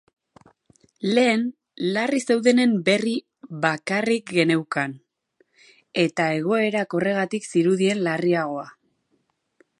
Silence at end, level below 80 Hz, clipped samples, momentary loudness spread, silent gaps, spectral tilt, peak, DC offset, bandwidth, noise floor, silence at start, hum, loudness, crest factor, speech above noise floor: 1.1 s; -72 dBFS; under 0.1%; 11 LU; none; -5 dB/octave; -2 dBFS; under 0.1%; 11.5 kHz; -70 dBFS; 1 s; none; -22 LUFS; 20 dB; 49 dB